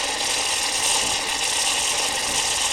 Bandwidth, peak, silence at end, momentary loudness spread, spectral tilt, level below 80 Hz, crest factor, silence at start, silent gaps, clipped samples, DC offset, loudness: 16.5 kHz; -8 dBFS; 0 s; 2 LU; 1 dB/octave; -50 dBFS; 16 dB; 0 s; none; under 0.1%; under 0.1%; -20 LUFS